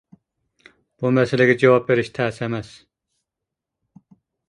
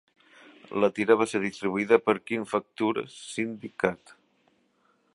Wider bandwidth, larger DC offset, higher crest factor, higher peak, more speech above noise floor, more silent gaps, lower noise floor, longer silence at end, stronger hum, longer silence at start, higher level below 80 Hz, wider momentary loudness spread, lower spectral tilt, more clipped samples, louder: about the same, 10.5 kHz vs 11.5 kHz; neither; about the same, 22 dB vs 24 dB; about the same, -2 dBFS vs -4 dBFS; first, 66 dB vs 42 dB; neither; first, -84 dBFS vs -68 dBFS; first, 1.85 s vs 1.2 s; neither; first, 1 s vs 0.7 s; first, -60 dBFS vs -70 dBFS; about the same, 12 LU vs 11 LU; first, -7 dB/octave vs -5.5 dB/octave; neither; first, -19 LUFS vs -27 LUFS